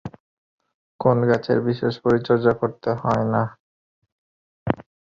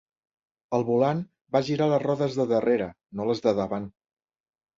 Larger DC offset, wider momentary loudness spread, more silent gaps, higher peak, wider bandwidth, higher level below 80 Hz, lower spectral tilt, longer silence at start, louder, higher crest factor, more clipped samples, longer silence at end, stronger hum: neither; about the same, 9 LU vs 9 LU; first, 0.20-0.58 s, 0.74-0.99 s, 3.60-4.02 s, 4.12-4.66 s vs 1.41-1.45 s; first, -2 dBFS vs -8 dBFS; about the same, 7.4 kHz vs 7.6 kHz; first, -54 dBFS vs -62 dBFS; about the same, -8.5 dB/octave vs -7.5 dB/octave; second, 0.05 s vs 0.7 s; first, -22 LUFS vs -26 LUFS; about the same, 20 dB vs 18 dB; neither; second, 0.3 s vs 0.85 s; neither